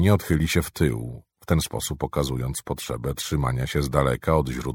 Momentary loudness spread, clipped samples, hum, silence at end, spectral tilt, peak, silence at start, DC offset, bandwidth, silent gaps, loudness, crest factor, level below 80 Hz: 8 LU; under 0.1%; none; 0 s; -5.5 dB/octave; -4 dBFS; 0 s; under 0.1%; 18 kHz; none; -25 LUFS; 20 dB; -36 dBFS